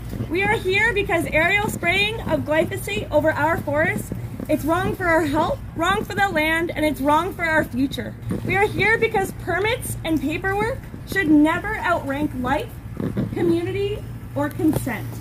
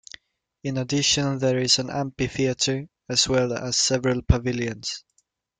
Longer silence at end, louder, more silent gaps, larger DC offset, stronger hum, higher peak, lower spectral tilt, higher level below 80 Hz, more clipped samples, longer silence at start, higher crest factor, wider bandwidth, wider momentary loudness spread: second, 0 s vs 0.6 s; about the same, -21 LUFS vs -23 LUFS; neither; neither; neither; second, -6 dBFS vs -2 dBFS; first, -5.5 dB/octave vs -3.5 dB/octave; about the same, -40 dBFS vs -38 dBFS; neither; second, 0 s vs 0.65 s; second, 14 dB vs 22 dB; first, 16 kHz vs 9.6 kHz; about the same, 9 LU vs 11 LU